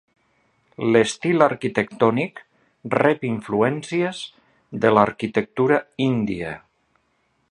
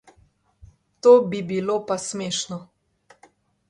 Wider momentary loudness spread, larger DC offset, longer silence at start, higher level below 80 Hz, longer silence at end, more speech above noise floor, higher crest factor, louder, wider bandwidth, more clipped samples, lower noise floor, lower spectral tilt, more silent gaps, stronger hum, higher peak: about the same, 12 LU vs 13 LU; neither; second, 0.8 s vs 1.05 s; about the same, -58 dBFS vs -62 dBFS; second, 0.9 s vs 1.05 s; first, 47 dB vs 40 dB; about the same, 22 dB vs 20 dB; about the same, -21 LUFS vs -21 LUFS; about the same, 11.5 kHz vs 11 kHz; neither; first, -67 dBFS vs -60 dBFS; first, -6 dB/octave vs -4.5 dB/octave; neither; neither; first, 0 dBFS vs -4 dBFS